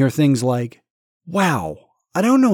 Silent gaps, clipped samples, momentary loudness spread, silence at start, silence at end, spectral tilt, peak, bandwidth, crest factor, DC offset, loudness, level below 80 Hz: 0.90-1.20 s; under 0.1%; 15 LU; 0 s; 0 s; -6.5 dB/octave; -4 dBFS; 18.5 kHz; 14 dB; under 0.1%; -19 LUFS; -56 dBFS